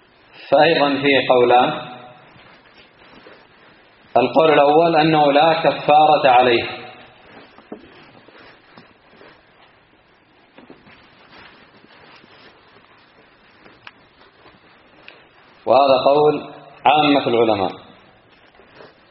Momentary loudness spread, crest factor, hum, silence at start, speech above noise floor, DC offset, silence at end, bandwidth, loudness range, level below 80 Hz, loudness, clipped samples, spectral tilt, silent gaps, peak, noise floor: 16 LU; 20 dB; none; 0.45 s; 40 dB; under 0.1%; 1.35 s; 5.6 kHz; 7 LU; -62 dBFS; -15 LUFS; under 0.1%; -2.5 dB/octave; none; 0 dBFS; -54 dBFS